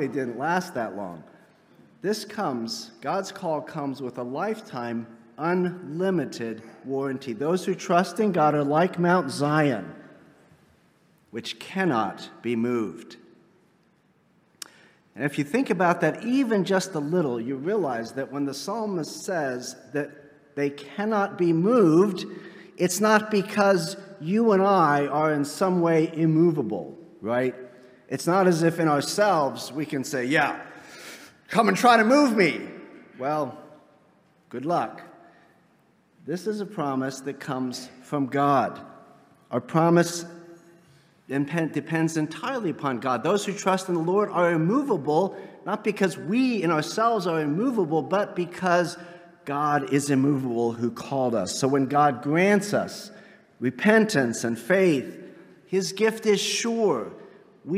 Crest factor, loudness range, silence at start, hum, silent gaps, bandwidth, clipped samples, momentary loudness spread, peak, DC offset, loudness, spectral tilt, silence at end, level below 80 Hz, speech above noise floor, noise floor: 20 dB; 8 LU; 0 s; none; none; 16 kHz; under 0.1%; 14 LU; -4 dBFS; under 0.1%; -25 LUFS; -5.5 dB/octave; 0 s; -76 dBFS; 39 dB; -63 dBFS